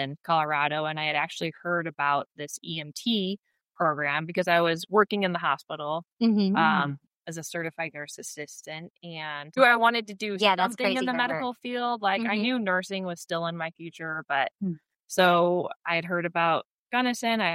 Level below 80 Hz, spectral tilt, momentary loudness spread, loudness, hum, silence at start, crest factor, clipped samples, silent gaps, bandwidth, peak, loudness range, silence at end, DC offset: -78 dBFS; -4.5 dB/octave; 15 LU; -26 LUFS; none; 0 s; 20 dB; under 0.1%; 3.39-3.43 s, 6.12-6.17 s, 8.90-8.94 s, 15.76-15.80 s, 16.65-16.86 s; 16 kHz; -6 dBFS; 4 LU; 0 s; under 0.1%